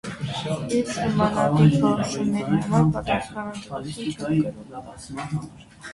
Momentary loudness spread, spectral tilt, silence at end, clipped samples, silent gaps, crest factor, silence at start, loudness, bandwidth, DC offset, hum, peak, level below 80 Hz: 17 LU; -6.5 dB/octave; 0 s; under 0.1%; none; 18 dB; 0.05 s; -23 LUFS; 11.5 kHz; under 0.1%; none; -6 dBFS; -48 dBFS